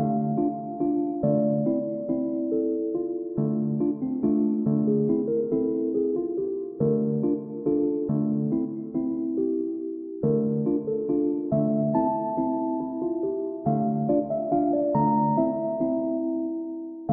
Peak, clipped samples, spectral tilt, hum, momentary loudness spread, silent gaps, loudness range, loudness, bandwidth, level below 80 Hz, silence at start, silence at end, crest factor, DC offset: -10 dBFS; under 0.1%; -14.5 dB/octave; none; 5 LU; none; 2 LU; -26 LUFS; 2.2 kHz; -60 dBFS; 0 s; 0 s; 16 dB; under 0.1%